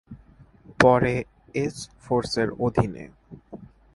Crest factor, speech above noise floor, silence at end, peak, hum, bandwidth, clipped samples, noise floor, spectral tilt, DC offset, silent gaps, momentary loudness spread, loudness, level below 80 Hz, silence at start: 24 dB; 29 dB; 0.3 s; -2 dBFS; none; 11.5 kHz; under 0.1%; -52 dBFS; -6 dB/octave; under 0.1%; none; 26 LU; -24 LUFS; -48 dBFS; 0.1 s